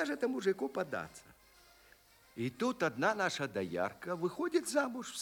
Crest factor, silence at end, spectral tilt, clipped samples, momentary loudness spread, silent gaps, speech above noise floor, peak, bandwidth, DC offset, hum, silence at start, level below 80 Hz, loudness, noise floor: 20 dB; 0 s; -4.5 dB/octave; under 0.1%; 9 LU; none; 28 dB; -16 dBFS; over 20 kHz; under 0.1%; none; 0 s; -74 dBFS; -36 LUFS; -64 dBFS